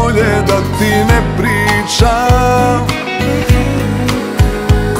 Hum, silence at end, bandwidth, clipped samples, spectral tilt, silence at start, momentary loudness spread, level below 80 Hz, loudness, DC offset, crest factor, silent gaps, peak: none; 0 s; 16 kHz; under 0.1%; -5.5 dB/octave; 0 s; 5 LU; -20 dBFS; -12 LUFS; 0.6%; 12 dB; none; 0 dBFS